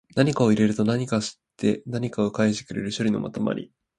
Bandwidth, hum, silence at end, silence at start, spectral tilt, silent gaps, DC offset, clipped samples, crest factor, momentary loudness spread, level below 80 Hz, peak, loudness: 11 kHz; none; 0.35 s; 0.15 s; -6 dB/octave; none; under 0.1%; under 0.1%; 20 dB; 9 LU; -58 dBFS; -4 dBFS; -24 LUFS